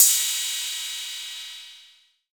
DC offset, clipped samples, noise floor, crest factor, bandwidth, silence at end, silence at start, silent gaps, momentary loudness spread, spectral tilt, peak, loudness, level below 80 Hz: under 0.1%; under 0.1%; -56 dBFS; 24 dB; over 20 kHz; 0.5 s; 0 s; none; 18 LU; 7 dB/octave; -2 dBFS; -24 LUFS; -88 dBFS